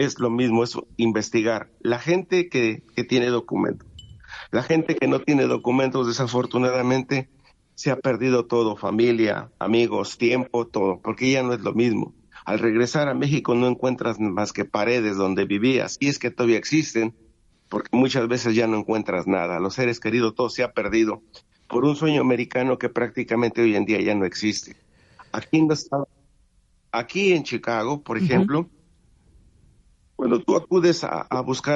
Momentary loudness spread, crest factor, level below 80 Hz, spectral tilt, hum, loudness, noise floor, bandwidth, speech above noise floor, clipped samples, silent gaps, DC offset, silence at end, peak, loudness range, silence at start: 7 LU; 16 dB; -58 dBFS; -5.5 dB/octave; none; -22 LUFS; -61 dBFS; 8 kHz; 39 dB; under 0.1%; none; under 0.1%; 0 s; -6 dBFS; 2 LU; 0 s